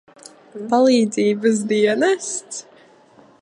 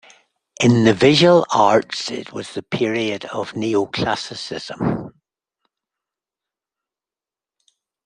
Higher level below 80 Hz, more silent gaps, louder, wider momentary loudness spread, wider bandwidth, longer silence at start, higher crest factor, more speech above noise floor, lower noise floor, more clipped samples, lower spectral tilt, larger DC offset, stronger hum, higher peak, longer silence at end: second, -74 dBFS vs -56 dBFS; neither; about the same, -18 LUFS vs -18 LUFS; about the same, 18 LU vs 16 LU; about the same, 11.5 kHz vs 10.5 kHz; about the same, 0.55 s vs 0.6 s; about the same, 16 dB vs 18 dB; second, 32 dB vs over 72 dB; second, -50 dBFS vs under -90 dBFS; neither; second, -4 dB/octave vs -5.5 dB/octave; neither; neither; about the same, -4 dBFS vs -2 dBFS; second, 0.8 s vs 2.95 s